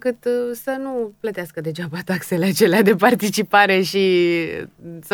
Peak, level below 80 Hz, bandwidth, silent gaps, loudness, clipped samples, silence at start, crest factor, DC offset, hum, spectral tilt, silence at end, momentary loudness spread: 0 dBFS; -62 dBFS; over 20 kHz; none; -19 LUFS; under 0.1%; 0.05 s; 18 dB; under 0.1%; none; -5 dB/octave; 0 s; 13 LU